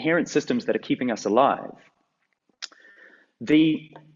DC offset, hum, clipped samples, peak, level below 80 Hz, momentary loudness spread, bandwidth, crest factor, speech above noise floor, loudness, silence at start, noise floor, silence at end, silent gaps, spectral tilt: under 0.1%; none; under 0.1%; -4 dBFS; -68 dBFS; 19 LU; 7.6 kHz; 20 dB; 50 dB; -23 LUFS; 0 s; -73 dBFS; 0.2 s; none; -5.5 dB/octave